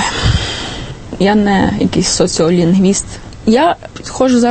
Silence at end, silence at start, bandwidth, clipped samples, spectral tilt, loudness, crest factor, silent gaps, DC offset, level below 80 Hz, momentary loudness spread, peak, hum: 0 s; 0 s; 8.8 kHz; under 0.1%; -5 dB/octave; -13 LUFS; 12 dB; none; under 0.1%; -28 dBFS; 13 LU; 0 dBFS; none